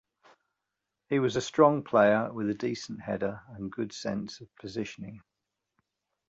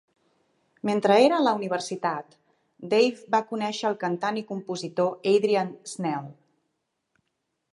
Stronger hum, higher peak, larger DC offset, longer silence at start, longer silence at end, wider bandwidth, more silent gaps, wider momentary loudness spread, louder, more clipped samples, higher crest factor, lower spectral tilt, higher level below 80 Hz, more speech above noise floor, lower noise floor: neither; about the same, -8 dBFS vs -6 dBFS; neither; first, 1.1 s vs 0.85 s; second, 1.1 s vs 1.4 s; second, 8 kHz vs 11.5 kHz; neither; first, 17 LU vs 13 LU; second, -29 LUFS vs -25 LUFS; neither; about the same, 22 dB vs 20 dB; about the same, -6 dB/octave vs -5 dB/octave; first, -66 dBFS vs -80 dBFS; about the same, 57 dB vs 54 dB; first, -86 dBFS vs -79 dBFS